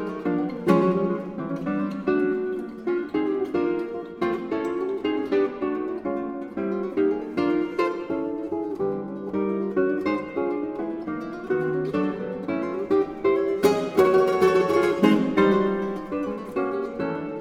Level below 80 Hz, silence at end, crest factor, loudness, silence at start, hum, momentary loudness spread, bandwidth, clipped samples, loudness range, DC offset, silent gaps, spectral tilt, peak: -58 dBFS; 0 s; 18 dB; -25 LUFS; 0 s; none; 10 LU; 15.5 kHz; under 0.1%; 6 LU; under 0.1%; none; -7 dB/octave; -6 dBFS